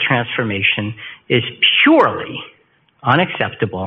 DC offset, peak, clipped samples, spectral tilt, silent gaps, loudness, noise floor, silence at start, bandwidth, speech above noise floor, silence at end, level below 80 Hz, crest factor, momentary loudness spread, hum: under 0.1%; 0 dBFS; under 0.1%; -2.5 dB/octave; none; -15 LUFS; -56 dBFS; 0 s; 5.8 kHz; 40 dB; 0 s; -56 dBFS; 16 dB; 16 LU; none